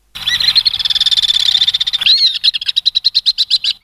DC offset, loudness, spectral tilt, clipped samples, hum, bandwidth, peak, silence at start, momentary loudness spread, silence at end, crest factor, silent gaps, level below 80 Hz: under 0.1%; -10 LUFS; 2 dB/octave; under 0.1%; none; 16 kHz; -2 dBFS; 0.15 s; 4 LU; 0.1 s; 12 dB; none; -48 dBFS